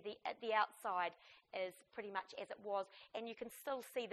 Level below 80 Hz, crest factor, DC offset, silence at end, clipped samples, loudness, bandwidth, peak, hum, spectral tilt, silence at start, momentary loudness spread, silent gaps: -88 dBFS; 22 dB; under 0.1%; 0 s; under 0.1%; -44 LUFS; 13 kHz; -22 dBFS; none; -3 dB/octave; 0 s; 12 LU; none